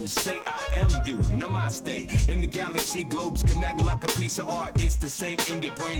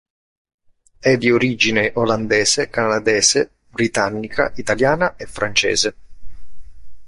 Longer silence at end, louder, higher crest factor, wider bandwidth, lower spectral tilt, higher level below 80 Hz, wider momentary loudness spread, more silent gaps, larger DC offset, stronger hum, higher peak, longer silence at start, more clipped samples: about the same, 0 s vs 0 s; second, -27 LUFS vs -17 LUFS; about the same, 14 dB vs 16 dB; first, over 20 kHz vs 11.5 kHz; first, -4.5 dB/octave vs -3 dB/octave; first, -30 dBFS vs -46 dBFS; second, 4 LU vs 7 LU; neither; neither; neither; second, -12 dBFS vs -2 dBFS; second, 0 s vs 1 s; neither